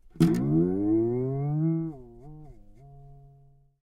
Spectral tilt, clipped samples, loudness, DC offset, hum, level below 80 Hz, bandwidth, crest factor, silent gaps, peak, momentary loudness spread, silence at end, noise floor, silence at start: -9 dB/octave; under 0.1%; -26 LUFS; under 0.1%; none; -52 dBFS; 14 kHz; 20 dB; none; -8 dBFS; 23 LU; 0.7 s; -57 dBFS; 0.15 s